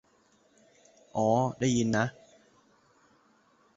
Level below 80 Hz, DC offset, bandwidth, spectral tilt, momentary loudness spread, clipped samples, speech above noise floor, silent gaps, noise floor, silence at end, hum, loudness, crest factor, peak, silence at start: -64 dBFS; under 0.1%; 8 kHz; -5.5 dB/octave; 7 LU; under 0.1%; 39 dB; none; -66 dBFS; 1.65 s; none; -29 LUFS; 20 dB; -12 dBFS; 1.15 s